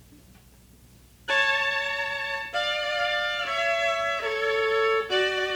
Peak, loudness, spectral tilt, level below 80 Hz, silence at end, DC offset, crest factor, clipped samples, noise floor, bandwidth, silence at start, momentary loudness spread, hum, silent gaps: -12 dBFS; -25 LUFS; -2 dB/octave; -58 dBFS; 0 s; under 0.1%; 16 dB; under 0.1%; -53 dBFS; over 20 kHz; 0.1 s; 5 LU; none; none